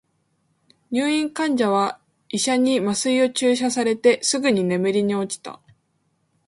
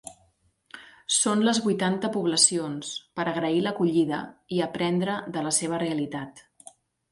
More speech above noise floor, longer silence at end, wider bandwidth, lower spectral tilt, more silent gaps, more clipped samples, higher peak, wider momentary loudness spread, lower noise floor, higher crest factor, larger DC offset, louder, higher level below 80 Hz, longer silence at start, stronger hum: first, 48 dB vs 40 dB; first, 0.95 s vs 0.7 s; about the same, 11.5 kHz vs 11.5 kHz; about the same, -4 dB/octave vs -3.5 dB/octave; neither; neither; about the same, -4 dBFS vs -4 dBFS; second, 9 LU vs 14 LU; about the same, -68 dBFS vs -66 dBFS; about the same, 18 dB vs 22 dB; neither; first, -21 LUFS vs -25 LUFS; about the same, -68 dBFS vs -68 dBFS; first, 0.9 s vs 0.05 s; neither